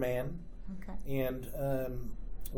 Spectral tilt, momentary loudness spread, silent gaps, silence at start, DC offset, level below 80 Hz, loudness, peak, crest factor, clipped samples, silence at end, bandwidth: -7 dB/octave; 12 LU; none; 0 s; under 0.1%; -44 dBFS; -39 LUFS; -22 dBFS; 14 dB; under 0.1%; 0 s; over 20 kHz